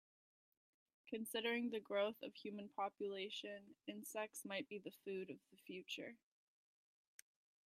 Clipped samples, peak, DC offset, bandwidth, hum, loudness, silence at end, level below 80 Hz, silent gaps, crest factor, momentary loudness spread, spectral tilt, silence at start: under 0.1%; -28 dBFS; under 0.1%; 15.5 kHz; none; -47 LUFS; 1.5 s; under -90 dBFS; none; 20 dB; 15 LU; -3.5 dB/octave; 1.05 s